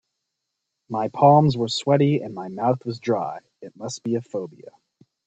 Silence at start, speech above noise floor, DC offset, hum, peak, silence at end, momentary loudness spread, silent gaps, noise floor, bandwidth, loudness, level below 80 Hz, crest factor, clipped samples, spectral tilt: 0.9 s; 59 dB; under 0.1%; none; -2 dBFS; 0.55 s; 17 LU; none; -80 dBFS; 8.6 kHz; -22 LUFS; -64 dBFS; 22 dB; under 0.1%; -6.5 dB/octave